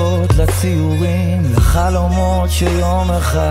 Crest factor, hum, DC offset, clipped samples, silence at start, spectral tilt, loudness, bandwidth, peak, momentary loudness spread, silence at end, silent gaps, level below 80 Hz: 12 dB; none; under 0.1%; under 0.1%; 0 s; -6 dB/octave; -15 LUFS; 16 kHz; 0 dBFS; 2 LU; 0 s; none; -18 dBFS